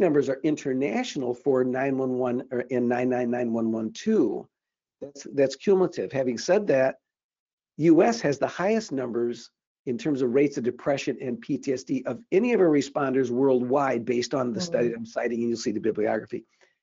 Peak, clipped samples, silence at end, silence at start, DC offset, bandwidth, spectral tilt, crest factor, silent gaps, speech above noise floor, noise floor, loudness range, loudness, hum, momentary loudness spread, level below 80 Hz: -8 dBFS; under 0.1%; 0.4 s; 0 s; under 0.1%; 7.6 kHz; -5.5 dB/octave; 16 dB; 7.24-7.29 s, 7.40-7.46 s, 7.53-7.58 s, 9.67-9.85 s; 38 dB; -63 dBFS; 3 LU; -25 LUFS; none; 9 LU; -70 dBFS